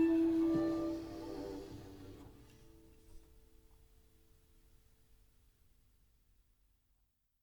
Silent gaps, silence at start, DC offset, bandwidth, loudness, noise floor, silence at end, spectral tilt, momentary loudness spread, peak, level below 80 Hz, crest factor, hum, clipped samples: none; 0 s; under 0.1%; 19 kHz; -37 LUFS; -78 dBFS; 4.25 s; -7.5 dB/octave; 23 LU; -24 dBFS; -64 dBFS; 18 dB; none; under 0.1%